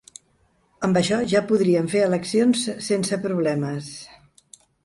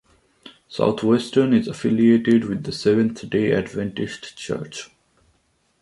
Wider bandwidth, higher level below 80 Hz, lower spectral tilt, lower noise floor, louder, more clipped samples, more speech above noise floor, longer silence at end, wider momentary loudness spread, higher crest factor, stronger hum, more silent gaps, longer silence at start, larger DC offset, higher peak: about the same, 11.5 kHz vs 11.5 kHz; about the same, -60 dBFS vs -56 dBFS; about the same, -5.5 dB/octave vs -6.5 dB/octave; about the same, -63 dBFS vs -65 dBFS; about the same, -22 LUFS vs -20 LUFS; neither; about the same, 42 dB vs 45 dB; second, 0.8 s vs 0.95 s; second, 9 LU vs 13 LU; about the same, 18 dB vs 18 dB; neither; neither; first, 0.8 s vs 0.45 s; neither; about the same, -6 dBFS vs -4 dBFS